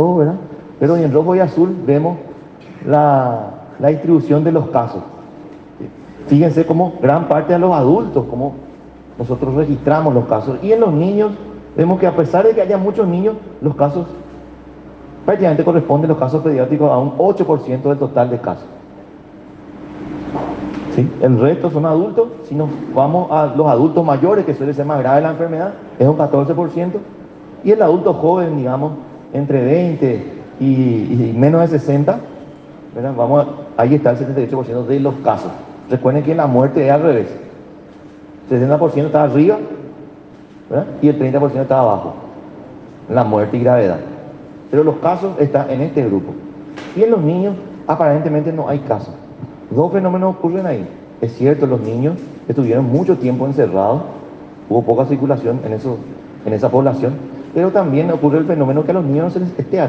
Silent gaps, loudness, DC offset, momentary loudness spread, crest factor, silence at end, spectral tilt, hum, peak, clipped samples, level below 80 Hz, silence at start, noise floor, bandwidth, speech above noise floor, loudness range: none; -15 LUFS; under 0.1%; 16 LU; 14 dB; 0 s; -10 dB/octave; none; 0 dBFS; under 0.1%; -50 dBFS; 0 s; -38 dBFS; 7 kHz; 25 dB; 3 LU